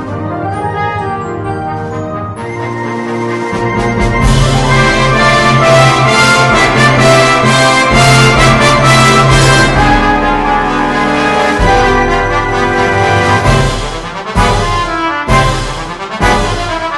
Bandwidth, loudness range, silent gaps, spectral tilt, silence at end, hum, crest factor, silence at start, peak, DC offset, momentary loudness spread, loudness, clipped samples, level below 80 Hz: 12 kHz; 9 LU; none; -4.5 dB/octave; 0 s; none; 10 dB; 0 s; 0 dBFS; under 0.1%; 12 LU; -9 LUFS; 0.6%; -20 dBFS